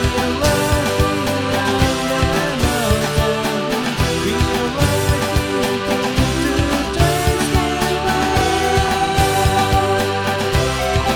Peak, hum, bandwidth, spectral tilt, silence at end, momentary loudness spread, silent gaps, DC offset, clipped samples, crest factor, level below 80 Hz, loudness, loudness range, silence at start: -2 dBFS; none; over 20 kHz; -4.5 dB/octave; 0 s; 3 LU; none; under 0.1%; under 0.1%; 16 dB; -26 dBFS; -17 LUFS; 1 LU; 0 s